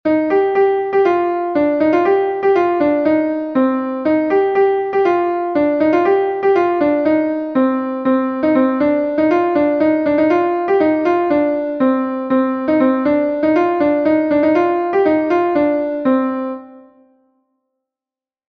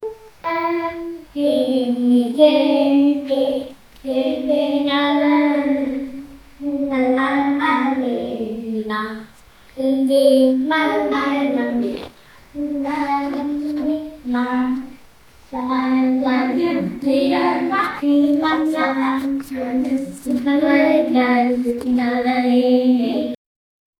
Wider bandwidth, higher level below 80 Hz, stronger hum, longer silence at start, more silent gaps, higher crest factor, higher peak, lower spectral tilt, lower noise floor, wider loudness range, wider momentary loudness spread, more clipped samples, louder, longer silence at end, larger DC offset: second, 6.2 kHz vs 13.5 kHz; about the same, -54 dBFS vs -52 dBFS; neither; about the same, 0.05 s vs 0 s; neither; second, 12 dB vs 18 dB; about the same, -2 dBFS vs 0 dBFS; first, -8 dB/octave vs -5.5 dB/octave; first, under -90 dBFS vs -46 dBFS; second, 1 LU vs 5 LU; second, 3 LU vs 12 LU; neither; first, -15 LUFS vs -18 LUFS; first, 1.7 s vs 0.65 s; neither